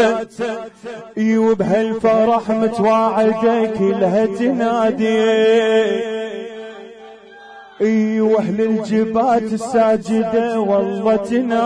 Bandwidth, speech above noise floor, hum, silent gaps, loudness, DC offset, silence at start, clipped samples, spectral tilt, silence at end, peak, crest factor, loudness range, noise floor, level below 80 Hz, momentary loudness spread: 10.5 kHz; 24 dB; none; none; -16 LUFS; under 0.1%; 0 s; under 0.1%; -6.5 dB/octave; 0 s; -4 dBFS; 12 dB; 3 LU; -39 dBFS; -56 dBFS; 11 LU